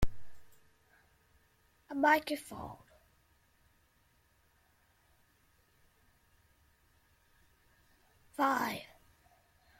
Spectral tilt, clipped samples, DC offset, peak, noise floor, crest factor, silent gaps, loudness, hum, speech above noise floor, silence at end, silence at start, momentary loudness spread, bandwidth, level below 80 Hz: -4.5 dB/octave; under 0.1%; under 0.1%; -16 dBFS; -71 dBFS; 24 dB; none; -33 LUFS; none; 39 dB; 0.95 s; 0 s; 21 LU; 16.5 kHz; -54 dBFS